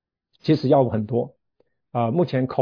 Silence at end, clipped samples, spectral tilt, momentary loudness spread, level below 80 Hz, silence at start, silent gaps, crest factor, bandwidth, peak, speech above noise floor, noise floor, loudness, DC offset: 0 s; under 0.1%; -9.5 dB/octave; 12 LU; -62 dBFS; 0.45 s; none; 16 dB; 5.4 kHz; -6 dBFS; 49 dB; -69 dBFS; -22 LUFS; under 0.1%